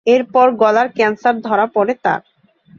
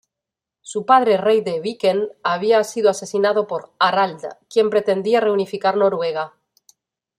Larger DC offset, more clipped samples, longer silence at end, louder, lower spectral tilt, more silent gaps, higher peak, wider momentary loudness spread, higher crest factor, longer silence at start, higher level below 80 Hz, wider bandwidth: neither; neither; second, 0.6 s vs 0.9 s; first, -15 LUFS vs -19 LUFS; about the same, -5.5 dB/octave vs -4.5 dB/octave; neither; about the same, -2 dBFS vs -2 dBFS; about the same, 7 LU vs 9 LU; about the same, 14 dB vs 18 dB; second, 0.05 s vs 0.65 s; first, -62 dBFS vs -70 dBFS; second, 7.2 kHz vs 13.5 kHz